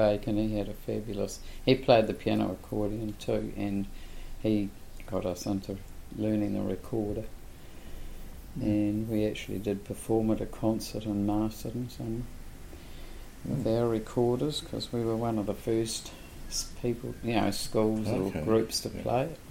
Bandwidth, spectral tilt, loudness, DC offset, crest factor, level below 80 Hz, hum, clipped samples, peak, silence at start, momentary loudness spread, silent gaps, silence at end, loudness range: 16.5 kHz; -6 dB/octave; -31 LUFS; under 0.1%; 24 dB; -44 dBFS; none; under 0.1%; -6 dBFS; 0 s; 19 LU; none; 0 s; 5 LU